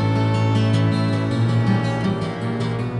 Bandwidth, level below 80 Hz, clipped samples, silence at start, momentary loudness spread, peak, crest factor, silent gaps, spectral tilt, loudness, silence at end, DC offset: 10.5 kHz; -48 dBFS; under 0.1%; 0 s; 6 LU; -8 dBFS; 12 dB; none; -7.5 dB/octave; -20 LUFS; 0 s; under 0.1%